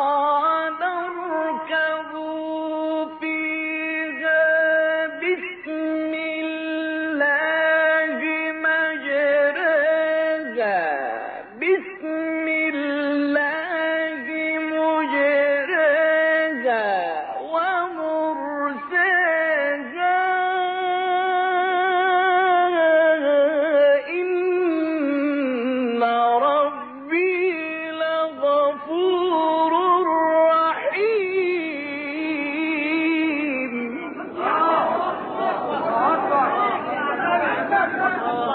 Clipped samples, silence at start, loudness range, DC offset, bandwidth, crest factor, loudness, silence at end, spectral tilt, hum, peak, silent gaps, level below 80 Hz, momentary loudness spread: under 0.1%; 0 s; 4 LU; under 0.1%; 4.7 kHz; 14 dB; -21 LUFS; 0 s; -7.5 dB/octave; none; -8 dBFS; none; -80 dBFS; 8 LU